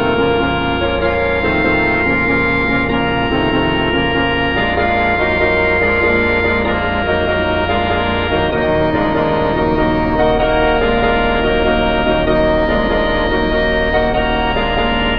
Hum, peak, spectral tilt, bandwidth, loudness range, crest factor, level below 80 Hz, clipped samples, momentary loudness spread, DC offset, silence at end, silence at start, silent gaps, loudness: none; -2 dBFS; -8 dB/octave; 5.2 kHz; 1 LU; 14 dB; -26 dBFS; under 0.1%; 3 LU; 2%; 0 s; 0 s; none; -14 LUFS